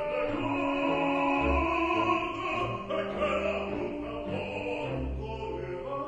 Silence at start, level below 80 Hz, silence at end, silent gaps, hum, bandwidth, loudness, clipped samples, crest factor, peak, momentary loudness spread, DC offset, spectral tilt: 0 s; -44 dBFS; 0 s; none; none; 9.6 kHz; -30 LUFS; under 0.1%; 16 dB; -16 dBFS; 9 LU; under 0.1%; -6.5 dB/octave